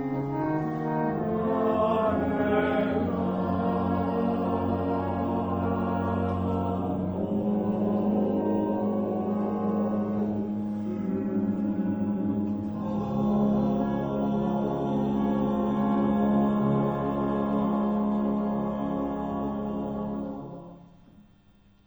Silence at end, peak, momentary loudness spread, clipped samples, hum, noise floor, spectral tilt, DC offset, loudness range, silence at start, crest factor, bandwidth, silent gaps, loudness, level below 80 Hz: 0.65 s; -12 dBFS; 6 LU; under 0.1%; none; -58 dBFS; -10 dB/octave; under 0.1%; 3 LU; 0 s; 16 dB; over 20 kHz; none; -27 LUFS; -52 dBFS